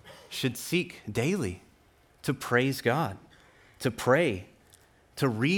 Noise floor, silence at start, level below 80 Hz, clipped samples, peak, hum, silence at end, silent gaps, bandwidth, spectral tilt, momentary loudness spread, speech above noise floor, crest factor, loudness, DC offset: -62 dBFS; 0.05 s; -64 dBFS; under 0.1%; -10 dBFS; none; 0 s; none; 19 kHz; -5.5 dB/octave; 14 LU; 34 dB; 20 dB; -29 LUFS; under 0.1%